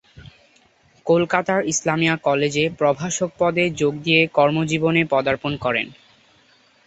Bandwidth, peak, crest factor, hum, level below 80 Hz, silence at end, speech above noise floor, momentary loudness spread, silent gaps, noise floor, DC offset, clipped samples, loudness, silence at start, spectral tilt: 8.4 kHz; 0 dBFS; 20 dB; none; -54 dBFS; 0.95 s; 37 dB; 6 LU; none; -57 dBFS; under 0.1%; under 0.1%; -19 LUFS; 0.15 s; -4.5 dB/octave